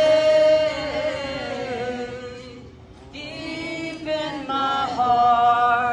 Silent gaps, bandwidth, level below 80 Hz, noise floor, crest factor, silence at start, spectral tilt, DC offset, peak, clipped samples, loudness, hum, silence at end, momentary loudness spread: none; 10 kHz; -50 dBFS; -43 dBFS; 14 dB; 0 s; -4.5 dB/octave; under 0.1%; -8 dBFS; under 0.1%; -21 LUFS; none; 0 s; 18 LU